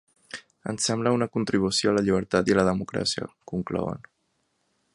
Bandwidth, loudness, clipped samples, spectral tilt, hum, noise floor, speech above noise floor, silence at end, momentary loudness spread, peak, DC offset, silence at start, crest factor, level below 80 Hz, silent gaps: 11.5 kHz; -25 LUFS; under 0.1%; -4.5 dB/octave; none; -73 dBFS; 48 dB; 0.95 s; 14 LU; -6 dBFS; under 0.1%; 0.35 s; 20 dB; -54 dBFS; none